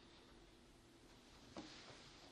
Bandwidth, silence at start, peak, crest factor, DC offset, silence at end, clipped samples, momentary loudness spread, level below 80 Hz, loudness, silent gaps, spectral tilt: 12 kHz; 0 s; -40 dBFS; 22 dB; under 0.1%; 0 s; under 0.1%; 10 LU; -74 dBFS; -61 LUFS; none; -3.5 dB/octave